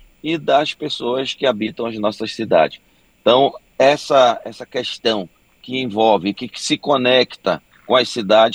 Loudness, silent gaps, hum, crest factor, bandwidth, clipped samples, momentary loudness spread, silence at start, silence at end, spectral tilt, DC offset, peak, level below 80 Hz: -18 LUFS; none; none; 16 dB; 12 kHz; under 0.1%; 10 LU; 0.25 s; 0 s; -4 dB/octave; under 0.1%; 0 dBFS; -60 dBFS